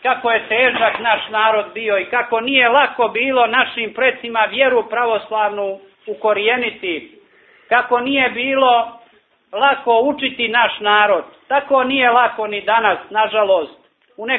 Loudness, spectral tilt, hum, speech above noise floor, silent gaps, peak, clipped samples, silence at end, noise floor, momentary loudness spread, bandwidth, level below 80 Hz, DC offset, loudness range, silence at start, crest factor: -16 LUFS; -6.5 dB/octave; none; 37 dB; none; 0 dBFS; under 0.1%; 0 s; -53 dBFS; 8 LU; 4.3 kHz; -60 dBFS; under 0.1%; 3 LU; 0.05 s; 16 dB